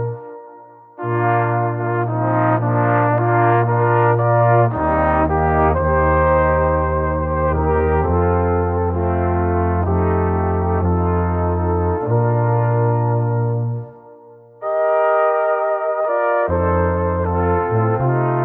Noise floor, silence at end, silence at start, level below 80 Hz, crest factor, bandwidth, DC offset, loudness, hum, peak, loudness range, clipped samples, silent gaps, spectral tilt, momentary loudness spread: -43 dBFS; 0 s; 0 s; -30 dBFS; 12 dB; 3.3 kHz; under 0.1%; -17 LUFS; none; -4 dBFS; 3 LU; under 0.1%; none; -12.5 dB/octave; 5 LU